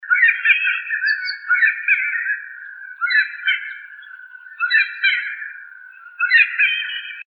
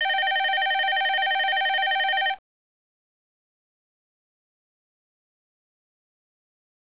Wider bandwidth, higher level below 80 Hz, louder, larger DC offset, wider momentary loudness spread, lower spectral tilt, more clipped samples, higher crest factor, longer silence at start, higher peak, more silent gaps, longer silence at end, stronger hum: first, 5.4 kHz vs 4 kHz; second, under -90 dBFS vs -78 dBFS; first, -17 LUFS vs -22 LUFS; second, under 0.1% vs 0.2%; first, 21 LU vs 2 LU; about the same, 7.5 dB/octave vs 7 dB/octave; neither; first, 20 dB vs 14 dB; about the same, 0 s vs 0 s; first, 0 dBFS vs -14 dBFS; neither; second, 0.05 s vs 4.6 s; neither